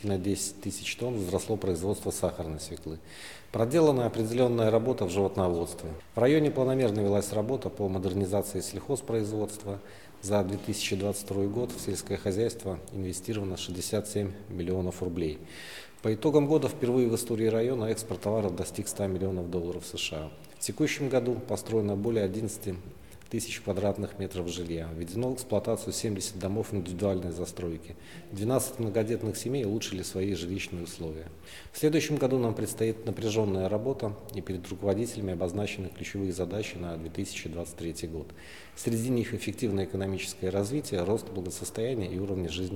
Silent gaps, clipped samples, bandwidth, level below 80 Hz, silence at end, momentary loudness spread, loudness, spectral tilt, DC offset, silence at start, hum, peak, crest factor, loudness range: none; under 0.1%; 18 kHz; -54 dBFS; 0 s; 11 LU; -31 LUFS; -5.5 dB/octave; 0.2%; 0 s; none; -10 dBFS; 22 dB; 6 LU